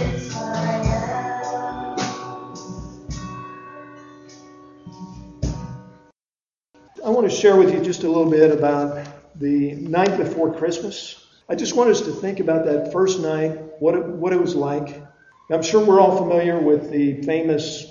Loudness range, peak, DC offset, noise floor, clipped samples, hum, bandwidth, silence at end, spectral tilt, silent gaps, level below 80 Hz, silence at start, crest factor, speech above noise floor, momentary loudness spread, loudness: 16 LU; -2 dBFS; under 0.1%; under -90 dBFS; under 0.1%; none; 7.6 kHz; 0.05 s; -5.5 dB/octave; none; -42 dBFS; 0 s; 20 dB; over 72 dB; 20 LU; -20 LUFS